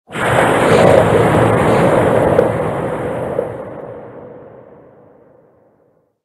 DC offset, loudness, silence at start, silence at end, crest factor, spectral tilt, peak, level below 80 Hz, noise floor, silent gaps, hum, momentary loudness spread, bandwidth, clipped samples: under 0.1%; -13 LUFS; 0.1 s; 1.75 s; 14 dB; -6.5 dB/octave; 0 dBFS; -40 dBFS; -57 dBFS; none; none; 21 LU; 12.5 kHz; under 0.1%